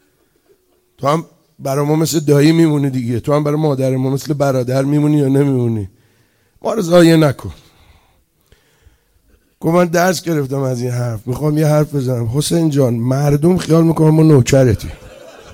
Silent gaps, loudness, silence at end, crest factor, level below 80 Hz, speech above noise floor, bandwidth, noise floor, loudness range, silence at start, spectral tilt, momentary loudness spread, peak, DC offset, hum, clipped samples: none; -14 LUFS; 0 s; 14 dB; -42 dBFS; 44 dB; 16.5 kHz; -57 dBFS; 5 LU; 1 s; -6.5 dB/octave; 11 LU; 0 dBFS; under 0.1%; none; under 0.1%